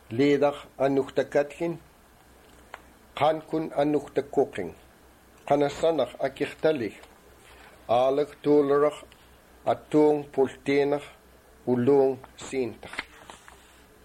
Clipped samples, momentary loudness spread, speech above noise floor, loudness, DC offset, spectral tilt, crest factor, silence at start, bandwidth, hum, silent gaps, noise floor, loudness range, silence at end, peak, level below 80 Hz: under 0.1%; 17 LU; 30 dB; -26 LUFS; under 0.1%; -6.5 dB/octave; 16 dB; 0.1 s; 14.5 kHz; none; none; -55 dBFS; 4 LU; 0.75 s; -10 dBFS; -60 dBFS